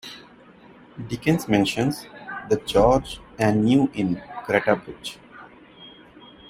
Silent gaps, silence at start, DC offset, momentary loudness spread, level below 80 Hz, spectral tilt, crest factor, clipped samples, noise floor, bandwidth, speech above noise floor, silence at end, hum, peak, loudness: none; 0.05 s; under 0.1%; 19 LU; -46 dBFS; -6 dB/octave; 20 dB; under 0.1%; -49 dBFS; 16 kHz; 28 dB; 0.6 s; none; -4 dBFS; -22 LUFS